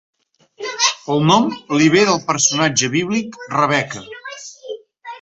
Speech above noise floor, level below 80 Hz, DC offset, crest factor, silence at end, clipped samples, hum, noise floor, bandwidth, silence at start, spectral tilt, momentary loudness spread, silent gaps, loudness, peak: 25 dB; -58 dBFS; under 0.1%; 18 dB; 0.05 s; under 0.1%; none; -41 dBFS; 8.2 kHz; 0.6 s; -3.5 dB/octave; 19 LU; none; -16 LUFS; -2 dBFS